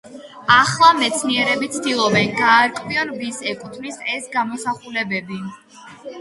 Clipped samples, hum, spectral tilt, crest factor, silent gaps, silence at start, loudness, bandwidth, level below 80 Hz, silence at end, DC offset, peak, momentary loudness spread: under 0.1%; none; -3 dB/octave; 20 dB; none; 0.05 s; -18 LUFS; 11.5 kHz; -60 dBFS; 0 s; under 0.1%; 0 dBFS; 17 LU